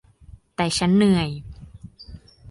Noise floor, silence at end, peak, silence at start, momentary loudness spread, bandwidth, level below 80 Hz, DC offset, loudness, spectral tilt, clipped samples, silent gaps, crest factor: -48 dBFS; 0 s; -8 dBFS; 0.6 s; 26 LU; 11.5 kHz; -46 dBFS; under 0.1%; -20 LUFS; -5.5 dB/octave; under 0.1%; none; 16 dB